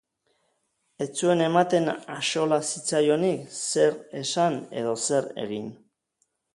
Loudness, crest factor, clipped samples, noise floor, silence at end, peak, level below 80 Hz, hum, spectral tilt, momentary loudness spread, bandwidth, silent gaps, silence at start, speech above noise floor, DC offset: -25 LUFS; 20 dB; under 0.1%; -74 dBFS; 0.8 s; -6 dBFS; -72 dBFS; none; -4 dB/octave; 11 LU; 11.5 kHz; none; 1 s; 49 dB; under 0.1%